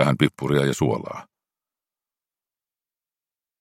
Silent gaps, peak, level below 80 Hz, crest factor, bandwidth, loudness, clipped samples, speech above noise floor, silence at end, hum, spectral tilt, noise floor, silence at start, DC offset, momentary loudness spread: none; 0 dBFS; -58 dBFS; 26 dB; 16 kHz; -22 LUFS; under 0.1%; over 68 dB; 2.4 s; none; -6 dB/octave; under -90 dBFS; 0 s; under 0.1%; 15 LU